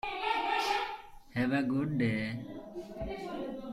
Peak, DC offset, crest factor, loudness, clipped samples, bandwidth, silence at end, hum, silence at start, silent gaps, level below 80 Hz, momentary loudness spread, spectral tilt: -18 dBFS; under 0.1%; 16 dB; -33 LUFS; under 0.1%; 14 kHz; 0 s; none; 0.05 s; none; -56 dBFS; 13 LU; -6 dB/octave